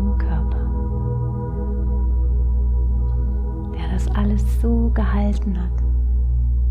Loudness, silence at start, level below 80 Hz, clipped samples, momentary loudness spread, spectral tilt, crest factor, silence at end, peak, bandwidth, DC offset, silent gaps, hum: -22 LUFS; 0 s; -20 dBFS; under 0.1%; 5 LU; -9 dB/octave; 10 dB; 0 s; -8 dBFS; 3.5 kHz; under 0.1%; none; 60 Hz at -20 dBFS